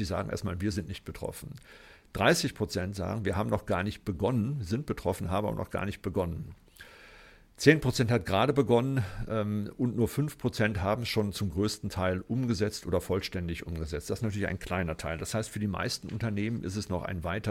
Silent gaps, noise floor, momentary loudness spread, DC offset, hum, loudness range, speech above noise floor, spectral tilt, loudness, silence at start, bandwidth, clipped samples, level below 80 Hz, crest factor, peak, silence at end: none; -55 dBFS; 10 LU; under 0.1%; none; 5 LU; 24 dB; -5.5 dB/octave; -31 LUFS; 0 s; 16.5 kHz; under 0.1%; -50 dBFS; 24 dB; -6 dBFS; 0 s